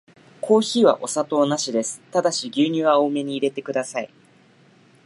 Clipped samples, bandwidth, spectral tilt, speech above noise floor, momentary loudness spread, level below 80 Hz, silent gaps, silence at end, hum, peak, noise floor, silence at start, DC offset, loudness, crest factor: under 0.1%; 11.5 kHz; -4 dB/octave; 34 dB; 9 LU; -78 dBFS; none; 1 s; none; -2 dBFS; -54 dBFS; 0.45 s; under 0.1%; -21 LUFS; 20 dB